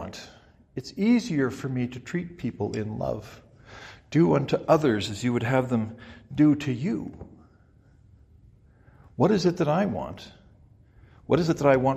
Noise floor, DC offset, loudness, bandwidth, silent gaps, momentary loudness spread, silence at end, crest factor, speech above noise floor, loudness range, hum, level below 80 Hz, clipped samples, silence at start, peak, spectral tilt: -57 dBFS; under 0.1%; -25 LUFS; 15 kHz; none; 19 LU; 0 s; 22 dB; 33 dB; 5 LU; none; -56 dBFS; under 0.1%; 0 s; -4 dBFS; -7 dB/octave